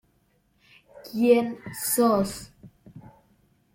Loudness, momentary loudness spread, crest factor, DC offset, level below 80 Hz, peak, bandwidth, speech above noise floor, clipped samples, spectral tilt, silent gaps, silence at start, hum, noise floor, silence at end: -24 LUFS; 17 LU; 20 dB; under 0.1%; -60 dBFS; -8 dBFS; 16.5 kHz; 44 dB; under 0.1%; -4.5 dB/octave; none; 1.05 s; none; -67 dBFS; 0.75 s